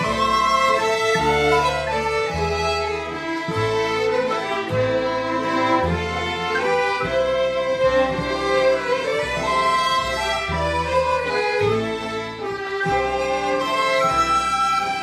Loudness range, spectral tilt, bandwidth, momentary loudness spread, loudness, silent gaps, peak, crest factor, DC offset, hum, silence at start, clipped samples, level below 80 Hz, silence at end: 2 LU; -4 dB/octave; 14 kHz; 5 LU; -20 LUFS; none; -6 dBFS; 16 dB; under 0.1%; none; 0 s; under 0.1%; -40 dBFS; 0 s